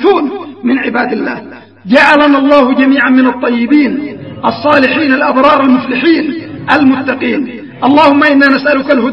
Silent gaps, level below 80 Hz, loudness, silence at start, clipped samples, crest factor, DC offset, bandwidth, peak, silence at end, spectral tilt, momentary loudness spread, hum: none; -48 dBFS; -9 LUFS; 0 s; 0.5%; 10 dB; 0.3%; 7.2 kHz; 0 dBFS; 0 s; -6 dB/octave; 11 LU; none